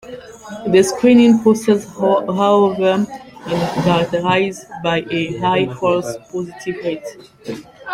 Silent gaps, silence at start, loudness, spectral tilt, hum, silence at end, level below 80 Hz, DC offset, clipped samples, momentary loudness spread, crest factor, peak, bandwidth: none; 0.05 s; -16 LUFS; -5.5 dB/octave; none; 0 s; -52 dBFS; under 0.1%; under 0.1%; 19 LU; 16 dB; -2 dBFS; 15.5 kHz